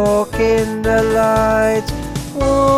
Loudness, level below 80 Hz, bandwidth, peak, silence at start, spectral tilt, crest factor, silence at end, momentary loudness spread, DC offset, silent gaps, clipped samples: -16 LUFS; -30 dBFS; 15.5 kHz; -2 dBFS; 0 s; -5.5 dB/octave; 12 dB; 0 s; 9 LU; under 0.1%; none; under 0.1%